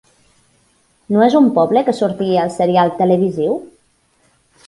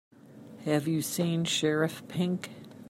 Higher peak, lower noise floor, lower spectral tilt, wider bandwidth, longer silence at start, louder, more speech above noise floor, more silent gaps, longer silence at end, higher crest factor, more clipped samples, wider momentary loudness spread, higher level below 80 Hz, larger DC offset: first, 0 dBFS vs -14 dBFS; first, -58 dBFS vs -50 dBFS; first, -7.5 dB/octave vs -5 dB/octave; second, 11.5 kHz vs 16 kHz; first, 1.1 s vs 0.25 s; first, -15 LUFS vs -30 LUFS; first, 44 dB vs 21 dB; neither; first, 1 s vs 0 s; about the same, 16 dB vs 18 dB; neither; second, 8 LU vs 11 LU; first, -58 dBFS vs -74 dBFS; neither